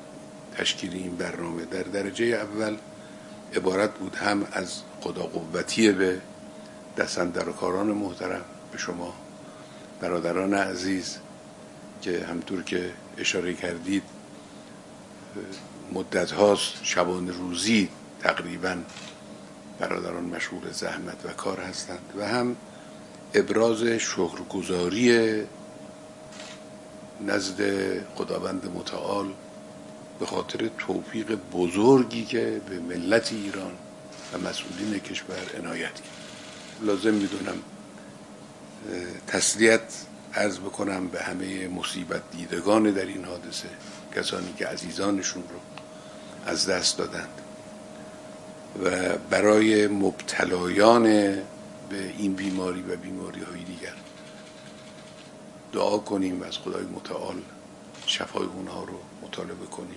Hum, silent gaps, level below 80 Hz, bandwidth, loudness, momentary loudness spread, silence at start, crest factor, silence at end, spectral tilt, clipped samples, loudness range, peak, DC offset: none; none; -68 dBFS; 12 kHz; -27 LUFS; 22 LU; 0 s; 28 dB; 0 s; -4 dB/octave; under 0.1%; 7 LU; 0 dBFS; under 0.1%